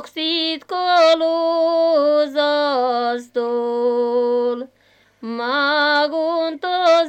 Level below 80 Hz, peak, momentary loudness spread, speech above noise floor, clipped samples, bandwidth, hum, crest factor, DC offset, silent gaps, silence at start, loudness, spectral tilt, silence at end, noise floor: -74 dBFS; -4 dBFS; 8 LU; 39 dB; under 0.1%; 8.8 kHz; none; 14 dB; under 0.1%; none; 0 s; -18 LUFS; -3 dB/octave; 0 s; -56 dBFS